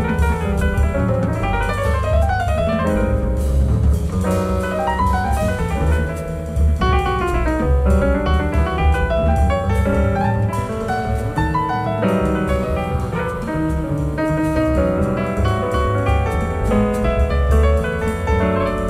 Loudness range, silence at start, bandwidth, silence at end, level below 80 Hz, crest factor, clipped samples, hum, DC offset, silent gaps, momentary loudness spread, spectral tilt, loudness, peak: 2 LU; 0 s; 13.5 kHz; 0 s; -22 dBFS; 12 dB; under 0.1%; none; under 0.1%; none; 4 LU; -7.5 dB/octave; -19 LUFS; -4 dBFS